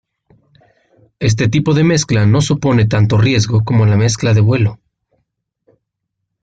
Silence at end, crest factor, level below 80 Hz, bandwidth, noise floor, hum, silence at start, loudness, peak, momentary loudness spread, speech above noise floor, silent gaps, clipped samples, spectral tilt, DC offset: 1.65 s; 12 dB; -42 dBFS; 9 kHz; -75 dBFS; none; 1.2 s; -13 LUFS; -2 dBFS; 3 LU; 63 dB; none; under 0.1%; -6 dB/octave; under 0.1%